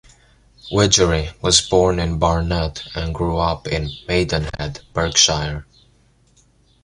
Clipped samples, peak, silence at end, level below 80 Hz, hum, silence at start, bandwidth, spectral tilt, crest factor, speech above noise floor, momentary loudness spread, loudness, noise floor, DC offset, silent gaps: under 0.1%; 0 dBFS; 1.2 s; -32 dBFS; none; 0.65 s; 11.5 kHz; -3.5 dB/octave; 20 dB; 37 dB; 12 LU; -18 LUFS; -56 dBFS; under 0.1%; none